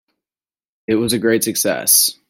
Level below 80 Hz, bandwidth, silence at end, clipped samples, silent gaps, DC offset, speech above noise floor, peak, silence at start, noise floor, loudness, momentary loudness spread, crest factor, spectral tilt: -58 dBFS; 16.5 kHz; 0.15 s; under 0.1%; none; under 0.1%; over 74 dB; 0 dBFS; 0.9 s; under -90 dBFS; -15 LUFS; 9 LU; 18 dB; -2.5 dB/octave